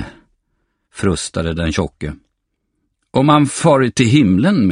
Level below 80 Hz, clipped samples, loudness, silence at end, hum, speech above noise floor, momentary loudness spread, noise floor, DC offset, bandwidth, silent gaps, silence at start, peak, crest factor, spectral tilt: -38 dBFS; under 0.1%; -15 LUFS; 0 s; none; 57 dB; 12 LU; -71 dBFS; under 0.1%; 11 kHz; none; 0 s; 0 dBFS; 16 dB; -6 dB/octave